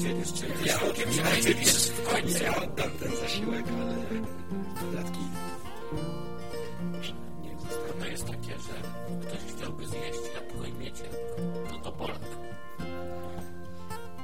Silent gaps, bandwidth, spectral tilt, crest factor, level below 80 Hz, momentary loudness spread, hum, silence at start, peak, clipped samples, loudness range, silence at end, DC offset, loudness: none; 16.5 kHz; -3.5 dB/octave; 24 dB; -50 dBFS; 16 LU; none; 0 s; -8 dBFS; under 0.1%; 12 LU; 0 s; 2%; -32 LUFS